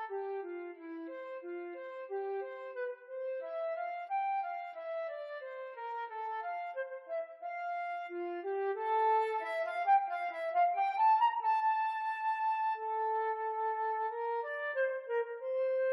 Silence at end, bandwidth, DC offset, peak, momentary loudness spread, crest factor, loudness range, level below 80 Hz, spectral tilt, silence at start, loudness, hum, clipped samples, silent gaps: 0 s; 11 kHz; under 0.1%; -20 dBFS; 13 LU; 16 dB; 10 LU; under -90 dBFS; -2 dB/octave; 0 s; -35 LUFS; none; under 0.1%; none